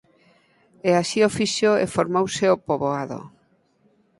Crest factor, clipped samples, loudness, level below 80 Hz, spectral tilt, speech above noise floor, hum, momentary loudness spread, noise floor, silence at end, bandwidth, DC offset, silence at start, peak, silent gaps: 20 dB; under 0.1%; -21 LUFS; -60 dBFS; -4.5 dB/octave; 41 dB; none; 8 LU; -62 dBFS; 0.9 s; 11.5 kHz; under 0.1%; 0.85 s; -4 dBFS; none